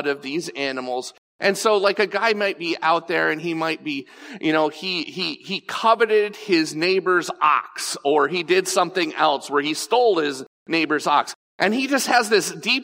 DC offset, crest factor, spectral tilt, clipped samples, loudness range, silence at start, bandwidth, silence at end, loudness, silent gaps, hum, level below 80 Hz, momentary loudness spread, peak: under 0.1%; 18 dB; -3 dB/octave; under 0.1%; 2 LU; 0 s; 16 kHz; 0 s; -21 LUFS; 1.18-1.39 s, 10.47-10.66 s, 11.35-11.59 s; none; -78 dBFS; 9 LU; -4 dBFS